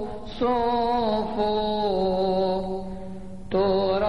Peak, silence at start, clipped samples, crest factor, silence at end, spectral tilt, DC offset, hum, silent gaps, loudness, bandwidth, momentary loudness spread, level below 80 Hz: -10 dBFS; 0 s; under 0.1%; 14 dB; 0 s; -7.5 dB/octave; 1%; none; none; -25 LUFS; 11 kHz; 13 LU; -44 dBFS